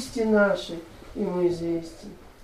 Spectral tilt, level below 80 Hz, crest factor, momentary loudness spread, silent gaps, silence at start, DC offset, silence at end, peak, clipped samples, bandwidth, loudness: -6 dB/octave; -50 dBFS; 16 dB; 20 LU; none; 0 s; under 0.1%; 0 s; -10 dBFS; under 0.1%; 14.5 kHz; -25 LUFS